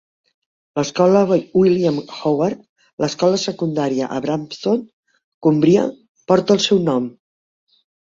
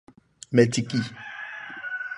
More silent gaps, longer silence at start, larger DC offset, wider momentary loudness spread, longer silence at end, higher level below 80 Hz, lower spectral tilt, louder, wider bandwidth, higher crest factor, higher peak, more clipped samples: first, 2.69-2.76 s, 2.93-2.98 s, 4.93-5.03 s, 5.24-5.41 s, 6.09-6.15 s vs none; first, 0.75 s vs 0.5 s; neither; second, 9 LU vs 15 LU; first, 0.9 s vs 0 s; first, -58 dBFS vs -64 dBFS; about the same, -6 dB/octave vs -5.5 dB/octave; first, -18 LUFS vs -26 LUFS; second, 7.6 kHz vs 11 kHz; second, 16 dB vs 22 dB; about the same, -2 dBFS vs -4 dBFS; neither